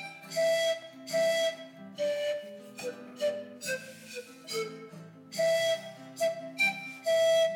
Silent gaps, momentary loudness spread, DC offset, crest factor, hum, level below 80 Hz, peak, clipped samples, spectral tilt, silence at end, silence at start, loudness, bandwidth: none; 16 LU; under 0.1%; 14 dB; none; -88 dBFS; -18 dBFS; under 0.1%; -2 dB/octave; 0 s; 0 s; -31 LUFS; 18.5 kHz